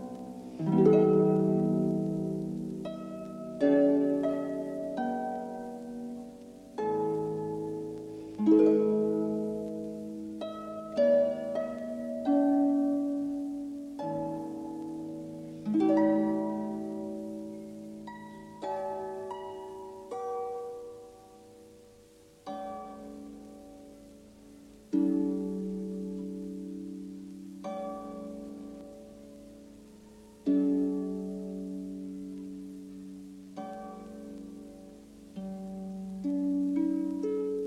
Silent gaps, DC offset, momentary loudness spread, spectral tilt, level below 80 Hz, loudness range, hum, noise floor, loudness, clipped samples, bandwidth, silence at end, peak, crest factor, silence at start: none; under 0.1%; 20 LU; -8.5 dB/octave; -66 dBFS; 14 LU; none; -57 dBFS; -31 LUFS; under 0.1%; 12 kHz; 0 s; -12 dBFS; 20 dB; 0 s